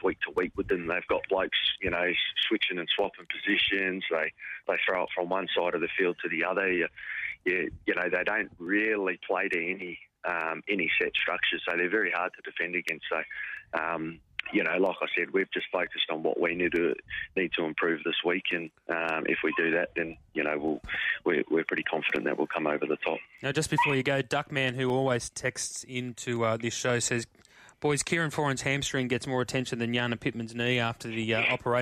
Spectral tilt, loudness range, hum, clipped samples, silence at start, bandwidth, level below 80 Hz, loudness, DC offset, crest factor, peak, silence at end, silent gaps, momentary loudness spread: -4 dB/octave; 2 LU; none; under 0.1%; 0 s; 15 kHz; -60 dBFS; -29 LUFS; under 0.1%; 18 dB; -12 dBFS; 0 s; none; 7 LU